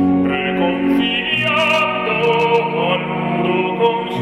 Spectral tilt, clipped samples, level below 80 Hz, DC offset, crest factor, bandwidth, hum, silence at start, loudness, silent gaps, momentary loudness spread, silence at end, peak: -6 dB/octave; under 0.1%; -50 dBFS; under 0.1%; 14 dB; 12.5 kHz; none; 0 s; -16 LUFS; none; 4 LU; 0 s; -2 dBFS